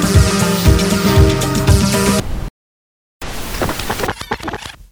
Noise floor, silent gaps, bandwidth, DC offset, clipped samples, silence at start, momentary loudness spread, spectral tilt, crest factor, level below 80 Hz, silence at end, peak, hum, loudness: under -90 dBFS; 2.50-3.20 s; over 20 kHz; under 0.1%; under 0.1%; 0 s; 16 LU; -5 dB/octave; 14 dB; -22 dBFS; 0.1 s; 0 dBFS; none; -15 LUFS